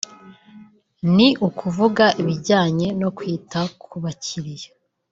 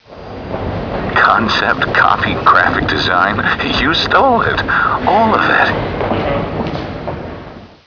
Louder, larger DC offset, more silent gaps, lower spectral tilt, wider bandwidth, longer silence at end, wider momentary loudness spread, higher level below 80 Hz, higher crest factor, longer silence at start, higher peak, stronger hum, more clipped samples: second, -20 LUFS vs -13 LUFS; neither; neither; about the same, -5.5 dB/octave vs -5.5 dB/octave; first, 7.8 kHz vs 5.4 kHz; first, 0.45 s vs 0.2 s; about the same, 15 LU vs 13 LU; second, -58 dBFS vs -34 dBFS; first, 20 dB vs 14 dB; first, 0.25 s vs 0.1 s; about the same, -2 dBFS vs 0 dBFS; neither; neither